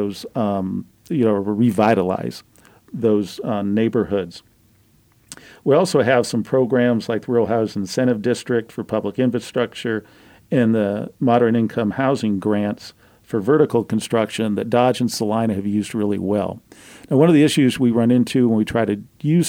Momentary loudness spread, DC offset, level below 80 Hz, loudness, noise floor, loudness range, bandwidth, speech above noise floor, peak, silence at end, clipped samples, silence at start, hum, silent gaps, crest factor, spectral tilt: 9 LU; under 0.1%; -58 dBFS; -19 LUFS; -56 dBFS; 4 LU; 16.5 kHz; 37 dB; -2 dBFS; 0 s; under 0.1%; 0 s; none; none; 16 dB; -6.5 dB/octave